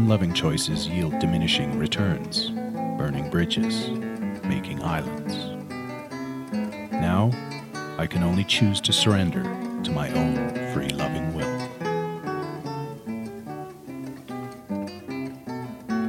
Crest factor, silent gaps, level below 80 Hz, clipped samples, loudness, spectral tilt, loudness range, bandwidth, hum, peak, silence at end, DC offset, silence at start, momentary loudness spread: 20 dB; none; -48 dBFS; under 0.1%; -26 LUFS; -5 dB/octave; 9 LU; 16.5 kHz; none; -6 dBFS; 0 s; under 0.1%; 0 s; 13 LU